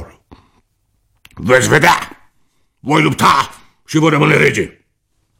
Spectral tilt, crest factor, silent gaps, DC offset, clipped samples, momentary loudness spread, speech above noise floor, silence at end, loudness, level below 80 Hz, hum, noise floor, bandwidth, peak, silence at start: -4.5 dB/octave; 16 dB; none; under 0.1%; under 0.1%; 15 LU; 52 dB; 0.7 s; -12 LUFS; -46 dBFS; none; -64 dBFS; 16.5 kHz; 0 dBFS; 0 s